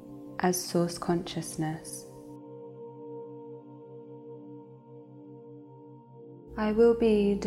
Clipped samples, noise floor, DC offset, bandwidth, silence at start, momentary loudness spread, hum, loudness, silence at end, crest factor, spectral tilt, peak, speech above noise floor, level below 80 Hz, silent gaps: under 0.1%; -50 dBFS; under 0.1%; 15.5 kHz; 0 s; 26 LU; none; -28 LUFS; 0 s; 18 dB; -5.5 dB/octave; -12 dBFS; 23 dB; -56 dBFS; none